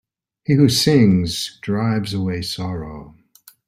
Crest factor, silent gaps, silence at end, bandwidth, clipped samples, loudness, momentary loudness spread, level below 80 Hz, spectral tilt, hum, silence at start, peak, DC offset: 16 dB; none; 0.6 s; 16 kHz; under 0.1%; -18 LUFS; 16 LU; -48 dBFS; -5.5 dB/octave; none; 0.5 s; -2 dBFS; under 0.1%